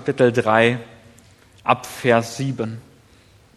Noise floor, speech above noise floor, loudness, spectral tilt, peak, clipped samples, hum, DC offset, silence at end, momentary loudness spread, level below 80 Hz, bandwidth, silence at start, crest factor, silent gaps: -52 dBFS; 33 dB; -20 LUFS; -5.5 dB/octave; 0 dBFS; under 0.1%; none; under 0.1%; 0.75 s; 13 LU; -60 dBFS; 14 kHz; 0 s; 22 dB; none